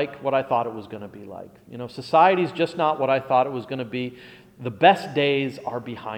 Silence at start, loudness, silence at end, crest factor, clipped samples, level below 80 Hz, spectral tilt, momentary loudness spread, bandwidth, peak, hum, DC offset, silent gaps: 0 s; -22 LUFS; 0 s; 20 dB; under 0.1%; -66 dBFS; -6.5 dB/octave; 20 LU; 14.5 kHz; -4 dBFS; none; under 0.1%; none